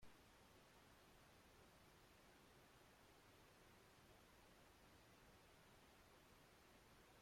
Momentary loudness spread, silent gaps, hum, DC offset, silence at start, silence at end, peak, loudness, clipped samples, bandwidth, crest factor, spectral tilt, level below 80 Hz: 0 LU; none; none; under 0.1%; 0 s; 0 s; -52 dBFS; -70 LUFS; under 0.1%; 16 kHz; 16 dB; -3.5 dB/octave; -80 dBFS